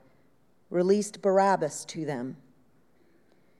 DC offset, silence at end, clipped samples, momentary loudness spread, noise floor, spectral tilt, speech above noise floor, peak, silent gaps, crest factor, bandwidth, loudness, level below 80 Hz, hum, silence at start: under 0.1%; 1.25 s; under 0.1%; 12 LU; -67 dBFS; -5.5 dB/octave; 40 dB; -12 dBFS; none; 18 dB; 13.5 kHz; -27 LUFS; -80 dBFS; none; 0.7 s